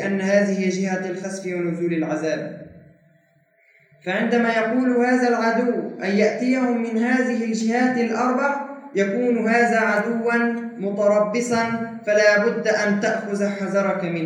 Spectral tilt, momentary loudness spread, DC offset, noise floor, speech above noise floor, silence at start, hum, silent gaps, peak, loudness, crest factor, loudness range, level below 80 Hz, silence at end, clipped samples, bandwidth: -5.5 dB/octave; 8 LU; under 0.1%; -60 dBFS; 40 dB; 0 s; none; none; -4 dBFS; -21 LUFS; 18 dB; 5 LU; -74 dBFS; 0 s; under 0.1%; 11 kHz